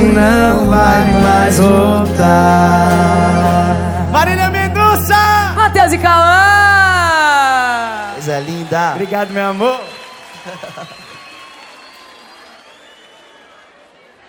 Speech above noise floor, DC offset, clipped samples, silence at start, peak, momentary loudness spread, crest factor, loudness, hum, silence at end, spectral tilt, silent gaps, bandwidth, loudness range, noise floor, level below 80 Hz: 34 dB; under 0.1%; 0.2%; 0 s; 0 dBFS; 14 LU; 12 dB; -11 LUFS; none; 2.8 s; -5.5 dB/octave; none; over 20 kHz; 11 LU; -45 dBFS; -32 dBFS